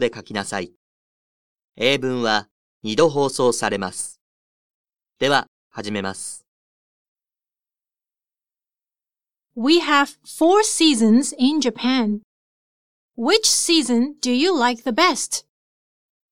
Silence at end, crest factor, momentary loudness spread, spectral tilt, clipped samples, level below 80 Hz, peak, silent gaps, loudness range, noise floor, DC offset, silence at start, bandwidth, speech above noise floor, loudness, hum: 0.9 s; 20 dB; 14 LU; -3 dB/octave; under 0.1%; -62 dBFS; -2 dBFS; 0.76-1.56 s, 1.64-1.68 s, 2.51-2.81 s, 4.21-4.84 s, 5.48-5.70 s, 6.48-7.15 s, 12.24-13.09 s; 9 LU; under -90 dBFS; 0.4%; 0 s; 16.5 kHz; over 71 dB; -19 LUFS; none